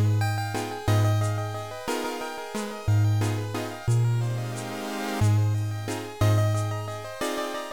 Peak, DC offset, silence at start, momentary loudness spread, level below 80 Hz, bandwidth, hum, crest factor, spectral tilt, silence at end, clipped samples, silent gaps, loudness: -12 dBFS; 0.4%; 0 s; 10 LU; -50 dBFS; 18 kHz; none; 12 dB; -6 dB/octave; 0 s; under 0.1%; none; -27 LUFS